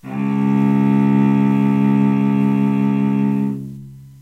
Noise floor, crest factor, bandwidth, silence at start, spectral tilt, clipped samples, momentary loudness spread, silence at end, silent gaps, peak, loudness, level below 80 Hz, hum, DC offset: -36 dBFS; 10 dB; 4.1 kHz; 0.05 s; -9.5 dB/octave; under 0.1%; 7 LU; 0.15 s; none; -6 dBFS; -16 LUFS; -60 dBFS; none; under 0.1%